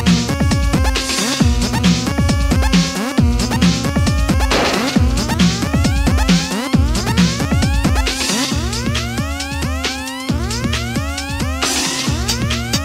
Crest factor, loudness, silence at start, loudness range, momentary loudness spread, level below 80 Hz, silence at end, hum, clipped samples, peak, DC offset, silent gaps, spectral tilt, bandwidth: 14 dB; -16 LUFS; 0 s; 4 LU; 6 LU; -22 dBFS; 0 s; none; under 0.1%; -2 dBFS; under 0.1%; none; -4.5 dB/octave; 16 kHz